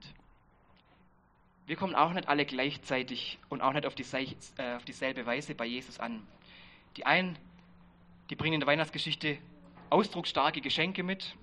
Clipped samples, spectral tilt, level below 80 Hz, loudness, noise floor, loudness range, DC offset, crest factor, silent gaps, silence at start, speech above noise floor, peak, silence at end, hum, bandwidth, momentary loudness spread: under 0.1%; -5 dB/octave; -66 dBFS; -32 LUFS; -66 dBFS; 4 LU; under 0.1%; 24 dB; none; 0 s; 33 dB; -10 dBFS; 0.05 s; none; 11 kHz; 12 LU